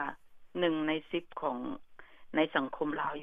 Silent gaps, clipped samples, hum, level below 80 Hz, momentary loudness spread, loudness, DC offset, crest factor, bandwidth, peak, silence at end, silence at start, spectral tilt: none; under 0.1%; none; -66 dBFS; 11 LU; -34 LUFS; under 0.1%; 22 dB; 4.7 kHz; -14 dBFS; 0 s; 0 s; -7.5 dB/octave